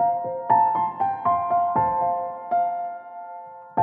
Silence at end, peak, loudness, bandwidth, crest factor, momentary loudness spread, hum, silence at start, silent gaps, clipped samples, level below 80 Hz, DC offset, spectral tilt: 0 s; -8 dBFS; -23 LUFS; 3.4 kHz; 16 dB; 18 LU; none; 0 s; none; under 0.1%; -60 dBFS; under 0.1%; -10.5 dB/octave